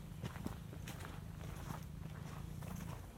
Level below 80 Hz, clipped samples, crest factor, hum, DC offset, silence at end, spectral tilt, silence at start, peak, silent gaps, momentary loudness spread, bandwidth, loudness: -56 dBFS; under 0.1%; 20 dB; none; under 0.1%; 0 s; -6 dB/octave; 0 s; -28 dBFS; none; 2 LU; 16.5 kHz; -49 LUFS